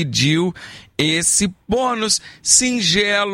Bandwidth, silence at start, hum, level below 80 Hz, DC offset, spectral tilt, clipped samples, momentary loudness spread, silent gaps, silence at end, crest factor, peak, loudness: 16.5 kHz; 0 s; none; -46 dBFS; under 0.1%; -2.5 dB/octave; under 0.1%; 8 LU; none; 0 s; 18 dB; 0 dBFS; -16 LUFS